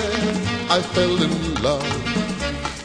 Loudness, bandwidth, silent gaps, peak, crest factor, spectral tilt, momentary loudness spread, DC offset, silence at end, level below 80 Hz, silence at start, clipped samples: -21 LUFS; 10.5 kHz; none; -4 dBFS; 18 dB; -4.5 dB/octave; 6 LU; under 0.1%; 0 s; -38 dBFS; 0 s; under 0.1%